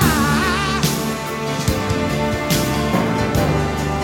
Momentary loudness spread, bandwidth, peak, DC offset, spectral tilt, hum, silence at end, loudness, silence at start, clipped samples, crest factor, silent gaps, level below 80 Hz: 5 LU; 17.5 kHz; -2 dBFS; under 0.1%; -5 dB/octave; none; 0 s; -19 LUFS; 0 s; under 0.1%; 16 dB; none; -32 dBFS